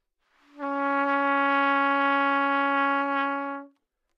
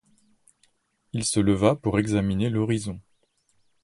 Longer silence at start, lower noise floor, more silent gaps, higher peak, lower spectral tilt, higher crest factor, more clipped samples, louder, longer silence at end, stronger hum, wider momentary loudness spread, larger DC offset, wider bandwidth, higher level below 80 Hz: second, 0.55 s vs 1.15 s; about the same, -66 dBFS vs -68 dBFS; neither; second, -12 dBFS vs -4 dBFS; second, -4 dB/octave vs -5.5 dB/octave; second, 14 dB vs 22 dB; neither; about the same, -24 LUFS vs -24 LUFS; second, 0.5 s vs 0.85 s; neither; second, 10 LU vs 13 LU; neither; second, 6.2 kHz vs 11.5 kHz; second, -88 dBFS vs -48 dBFS